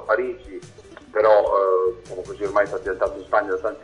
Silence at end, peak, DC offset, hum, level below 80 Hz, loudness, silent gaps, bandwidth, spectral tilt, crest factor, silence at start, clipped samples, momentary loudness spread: 0 s; -2 dBFS; under 0.1%; none; -50 dBFS; -21 LUFS; none; 10.5 kHz; -5.5 dB/octave; 20 dB; 0 s; under 0.1%; 17 LU